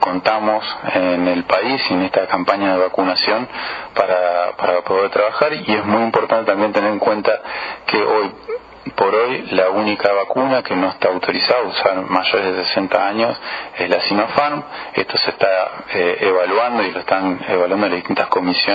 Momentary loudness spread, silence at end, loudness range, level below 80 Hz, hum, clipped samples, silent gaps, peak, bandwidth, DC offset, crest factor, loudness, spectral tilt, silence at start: 5 LU; 0 s; 1 LU; -58 dBFS; none; under 0.1%; none; 0 dBFS; 7 kHz; under 0.1%; 18 dB; -17 LUFS; -6.5 dB/octave; 0 s